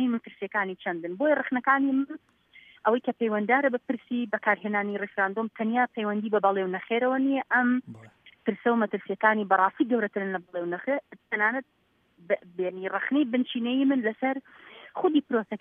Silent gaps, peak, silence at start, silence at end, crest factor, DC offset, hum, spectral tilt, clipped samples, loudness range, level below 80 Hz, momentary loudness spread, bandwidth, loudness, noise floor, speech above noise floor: none; -8 dBFS; 0 s; 0.05 s; 20 dB; under 0.1%; none; -8.5 dB/octave; under 0.1%; 3 LU; -82 dBFS; 8 LU; 3.8 kHz; -27 LUFS; -59 dBFS; 33 dB